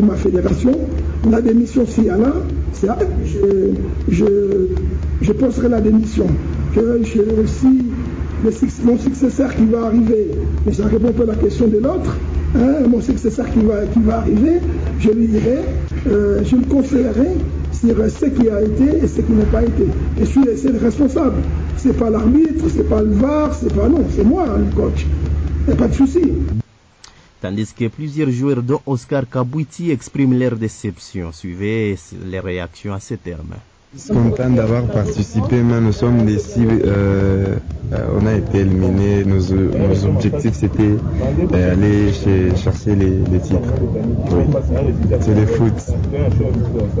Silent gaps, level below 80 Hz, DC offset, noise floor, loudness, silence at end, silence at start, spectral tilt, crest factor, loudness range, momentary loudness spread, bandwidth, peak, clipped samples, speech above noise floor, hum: none; -24 dBFS; under 0.1%; -45 dBFS; -16 LUFS; 0 s; 0 s; -8.5 dB/octave; 10 dB; 5 LU; 7 LU; 8 kHz; -6 dBFS; under 0.1%; 31 dB; none